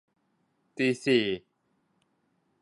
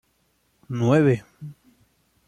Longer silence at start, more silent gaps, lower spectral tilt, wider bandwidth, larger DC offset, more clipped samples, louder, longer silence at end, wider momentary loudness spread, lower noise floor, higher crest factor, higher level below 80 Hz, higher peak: about the same, 0.8 s vs 0.7 s; neither; second, -5 dB/octave vs -8 dB/octave; about the same, 11.5 kHz vs 11 kHz; neither; neither; second, -27 LUFS vs -21 LUFS; first, 1.25 s vs 0.75 s; second, 14 LU vs 24 LU; first, -74 dBFS vs -67 dBFS; about the same, 20 dB vs 18 dB; second, -72 dBFS vs -62 dBFS; second, -12 dBFS vs -8 dBFS